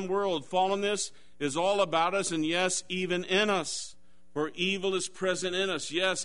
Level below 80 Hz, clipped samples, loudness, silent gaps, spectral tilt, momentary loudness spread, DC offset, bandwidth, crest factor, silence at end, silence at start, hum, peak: -68 dBFS; under 0.1%; -29 LUFS; none; -3 dB/octave; 9 LU; 0.4%; 11 kHz; 18 dB; 0 s; 0 s; none; -12 dBFS